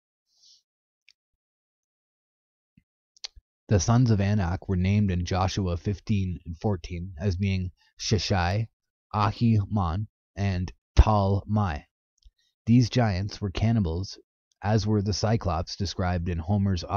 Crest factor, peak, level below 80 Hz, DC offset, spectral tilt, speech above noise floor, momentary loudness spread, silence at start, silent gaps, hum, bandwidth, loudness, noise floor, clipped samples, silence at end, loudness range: 20 dB; -6 dBFS; -36 dBFS; under 0.1%; -6.5 dB/octave; over 65 dB; 12 LU; 3.7 s; 7.93-7.97 s, 8.73-8.80 s, 8.90-9.10 s, 10.09-10.34 s, 10.78-10.95 s, 11.91-12.17 s, 12.54-12.65 s, 14.24-14.51 s; none; 7.2 kHz; -26 LUFS; under -90 dBFS; under 0.1%; 0 s; 3 LU